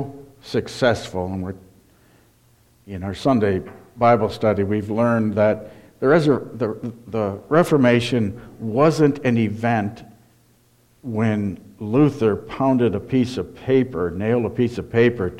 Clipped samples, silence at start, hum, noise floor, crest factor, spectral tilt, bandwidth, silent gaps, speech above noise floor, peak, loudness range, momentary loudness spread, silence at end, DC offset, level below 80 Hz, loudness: under 0.1%; 0 s; none; -57 dBFS; 18 dB; -7.5 dB/octave; 14 kHz; none; 38 dB; -4 dBFS; 4 LU; 13 LU; 0 s; under 0.1%; -52 dBFS; -20 LUFS